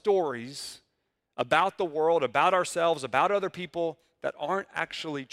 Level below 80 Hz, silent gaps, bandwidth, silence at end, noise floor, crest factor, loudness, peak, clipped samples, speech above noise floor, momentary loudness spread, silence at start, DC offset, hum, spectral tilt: -70 dBFS; none; 15 kHz; 0.05 s; -79 dBFS; 22 dB; -28 LUFS; -6 dBFS; under 0.1%; 51 dB; 12 LU; 0.05 s; under 0.1%; none; -4 dB/octave